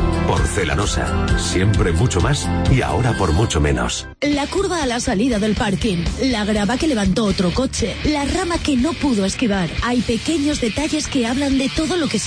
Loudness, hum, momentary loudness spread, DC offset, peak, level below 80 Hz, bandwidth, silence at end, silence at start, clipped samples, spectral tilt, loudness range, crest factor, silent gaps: -19 LUFS; none; 3 LU; under 0.1%; -4 dBFS; -28 dBFS; 10.5 kHz; 0 s; 0 s; under 0.1%; -5 dB/octave; 1 LU; 14 dB; none